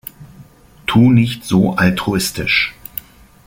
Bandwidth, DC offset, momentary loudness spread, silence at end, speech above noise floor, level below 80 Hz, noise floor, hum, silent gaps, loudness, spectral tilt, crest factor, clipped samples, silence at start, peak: 17 kHz; under 0.1%; 18 LU; 0.45 s; 29 dB; -42 dBFS; -43 dBFS; none; none; -15 LUFS; -5.5 dB/octave; 16 dB; under 0.1%; 0.2 s; -2 dBFS